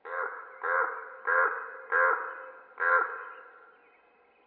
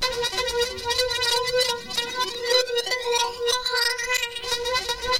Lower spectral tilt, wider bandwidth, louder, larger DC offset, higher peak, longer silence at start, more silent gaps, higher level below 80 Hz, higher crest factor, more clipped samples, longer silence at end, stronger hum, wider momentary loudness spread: first, -4 dB/octave vs 0 dB/octave; second, 4.2 kHz vs 17 kHz; second, -29 LUFS vs -23 LUFS; neither; second, -12 dBFS vs -8 dBFS; about the same, 0.05 s vs 0 s; neither; second, under -90 dBFS vs -48 dBFS; about the same, 20 dB vs 16 dB; neither; first, 0.8 s vs 0 s; neither; first, 18 LU vs 5 LU